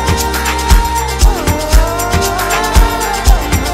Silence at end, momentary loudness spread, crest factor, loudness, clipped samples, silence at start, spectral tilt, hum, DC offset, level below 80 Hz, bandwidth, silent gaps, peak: 0 s; 2 LU; 10 dB; -13 LUFS; 0.2%; 0 s; -4 dB/octave; none; under 0.1%; -14 dBFS; 16.5 kHz; none; 0 dBFS